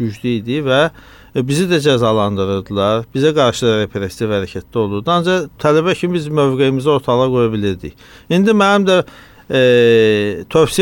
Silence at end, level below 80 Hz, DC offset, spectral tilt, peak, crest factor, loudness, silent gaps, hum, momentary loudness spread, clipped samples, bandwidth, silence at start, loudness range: 0 s; -46 dBFS; under 0.1%; -6 dB/octave; -2 dBFS; 12 dB; -15 LUFS; none; none; 9 LU; under 0.1%; 17 kHz; 0 s; 3 LU